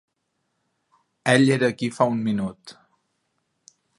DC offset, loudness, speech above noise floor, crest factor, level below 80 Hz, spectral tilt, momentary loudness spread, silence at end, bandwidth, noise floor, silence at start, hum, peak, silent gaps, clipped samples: under 0.1%; -22 LUFS; 54 dB; 24 dB; -64 dBFS; -5.5 dB/octave; 11 LU; 1.25 s; 11.5 kHz; -75 dBFS; 1.25 s; none; -2 dBFS; none; under 0.1%